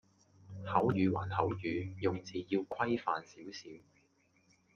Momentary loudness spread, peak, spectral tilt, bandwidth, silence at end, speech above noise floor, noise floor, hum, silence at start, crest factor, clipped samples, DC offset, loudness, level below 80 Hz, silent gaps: 16 LU; -16 dBFS; -7 dB/octave; 7 kHz; 0.95 s; 37 dB; -72 dBFS; none; 0.45 s; 22 dB; under 0.1%; under 0.1%; -35 LUFS; -72 dBFS; none